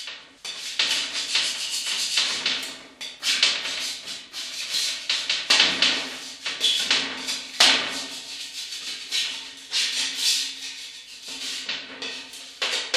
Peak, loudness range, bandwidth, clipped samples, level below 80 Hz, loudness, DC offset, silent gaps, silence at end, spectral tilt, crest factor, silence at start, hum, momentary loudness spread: -2 dBFS; 5 LU; 15.5 kHz; under 0.1%; -70 dBFS; -23 LUFS; under 0.1%; none; 0 s; 1.5 dB/octave; 24 dB; 0 s; none; 16 LU